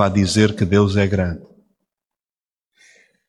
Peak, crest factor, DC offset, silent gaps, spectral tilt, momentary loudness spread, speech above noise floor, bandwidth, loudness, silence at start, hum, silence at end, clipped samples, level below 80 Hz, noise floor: -2 dBFS; 18 dB; under 0.1%; none; -6 dB/octave; 9 LU; over 74 dB; 11.5 kHz; -17 LUFS; 0 s; none; 1.85 s; under 0.1%; -44 dBFS; under -90 dBFS